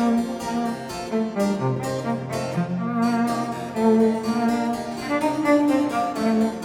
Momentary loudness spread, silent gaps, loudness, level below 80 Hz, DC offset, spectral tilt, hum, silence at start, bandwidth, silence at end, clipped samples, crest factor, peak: 8 LU; none; -23 LUFS; -56 dBFS; under 0.1%; -6.5 dB/octave; none; 0 s; 15.5 kHz; 0 s; under 0.1%; 16 dB; -6 dBFS